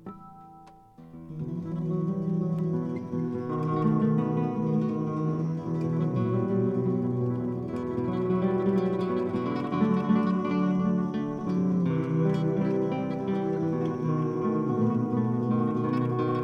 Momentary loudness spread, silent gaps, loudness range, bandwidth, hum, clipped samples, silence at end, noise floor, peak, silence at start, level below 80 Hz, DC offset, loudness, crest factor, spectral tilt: 6 LU; none; 2 LU; 6.4 kHz; none; under 0.1%; 0 s; -51 dBFS; -12 dBFS; 0.05 s; -62 dBFS; under 0.1%; -28 LUFS; 14 dB; -10 dB/octave